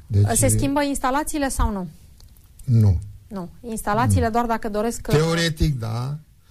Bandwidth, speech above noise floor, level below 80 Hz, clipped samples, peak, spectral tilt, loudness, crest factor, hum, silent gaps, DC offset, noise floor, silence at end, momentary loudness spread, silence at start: 15.5 kHz; 27 dB; -32 dBFS; under 0.1%; -8 dBFS; -5.5 dB/octave; -21 LUFS; 14 dB; none; none; under 0.1%; -47 dBFS; 0.3 s; 16 LU; 0.1 s